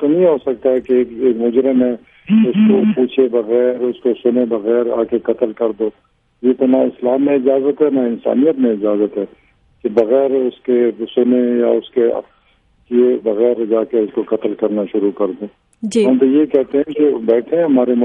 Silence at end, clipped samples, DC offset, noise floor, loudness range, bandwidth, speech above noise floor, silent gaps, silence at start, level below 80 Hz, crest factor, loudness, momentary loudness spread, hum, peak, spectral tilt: 0 s; under 0.1%; under 0.1%; -55 dBFS; 3 LU; 9.4 kHz; 41 dB; none; 0 s; -58 dBFS; 14 dB; -15 LUFS; 6 LU; none; 0 dBFS; -7.5 dB/octave